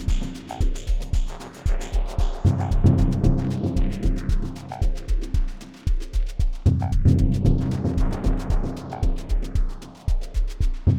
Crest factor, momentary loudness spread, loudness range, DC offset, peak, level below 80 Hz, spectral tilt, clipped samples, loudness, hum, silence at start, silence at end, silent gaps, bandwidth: 16 dB; 10 LU; 4 LU; under 0.1%; -6 dBFS; -24 dBFS; -7.5 dB/octave; under 0.1%; -25 LUFS; none; 0 s; 0 s; none; 9.8 kHz